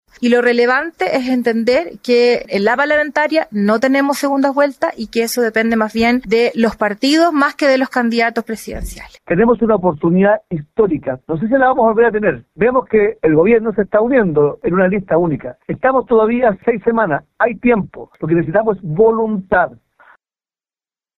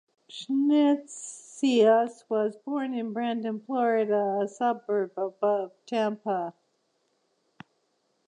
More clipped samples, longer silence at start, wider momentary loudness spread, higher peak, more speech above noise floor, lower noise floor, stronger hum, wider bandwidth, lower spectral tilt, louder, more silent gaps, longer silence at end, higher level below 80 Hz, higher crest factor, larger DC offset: neither; about the same, 0.2 s vs 0.3 s; second, 7 LU vs 10 LU; first, 0 dBFS vs -10 dBFS; first, over 76 dB vs 47 dB; first, under -90 dBFS vs -73 dBFS; neither; first, 14.5 kHz vs 10.5 kHz; about the same, -6 dB/octave vs -5 dB/octave; first, -15 LUFS vs -27 LUFS; neither; second, 1.45 s vs 1.75 s; first, -42 dBFS vs -86 dBFS; about the same, 14 dB vs 18 dB; neither